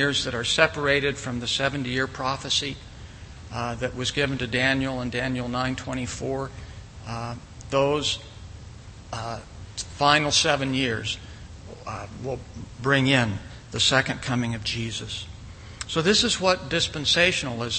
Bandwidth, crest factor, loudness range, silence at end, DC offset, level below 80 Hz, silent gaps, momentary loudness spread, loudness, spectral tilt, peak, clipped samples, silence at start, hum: 8.8 kHz; 24 dB; 5 LU; 0 s; under 0.1%; -46 dBFS; none; 21 LU; -24 LUFS; -3.5 dB/octave; -2 dBFS; under 0.1%; 0 s; none